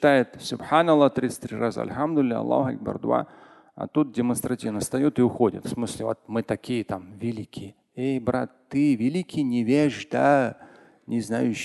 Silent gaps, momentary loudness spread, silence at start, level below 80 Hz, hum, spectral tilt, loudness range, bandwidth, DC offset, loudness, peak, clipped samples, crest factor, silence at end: none; 11 LU; 0 s; -58 dBFS; none; -6 dB/octave; 4 LU; 12.5 kHz; under 0.1%; -25 LUFS; -6 dBFS; under 0.1%; 20 dB; 0 s